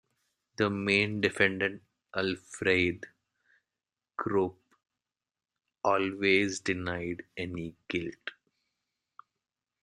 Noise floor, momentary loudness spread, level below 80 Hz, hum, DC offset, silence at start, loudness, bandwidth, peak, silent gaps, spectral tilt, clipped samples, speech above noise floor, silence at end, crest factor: under -90 dBFS; 15 LU; -68 dBFS; none; under 0.1%; 0.6 s; -30 LUFS; 10.5 kHz; -8 dBFS; none; -5 dB/octave; under 0.1%; over 60 dB; 1.5 s; 24 dB